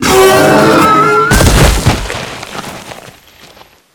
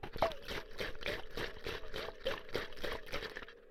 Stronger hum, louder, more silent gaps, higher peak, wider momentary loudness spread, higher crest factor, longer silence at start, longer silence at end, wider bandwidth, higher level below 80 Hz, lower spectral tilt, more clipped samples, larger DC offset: neither; first, -7 LUFS vs -42 LUFS; neither; first, 0 dBFS vs -18 dBFS; first, 18 LU vs 7 LU; second, 10 dB vs 22 dB; about the same, 0 s vs 0 s; first, 0.85 s vs 0 s; first, 20 kHz vs 16 kHz; first, -20 dBFS vs -50 dBFS; about the same, -4.5 dB/octave vs -4 dB/octave; first, 0.9% vs under 0.1%; neither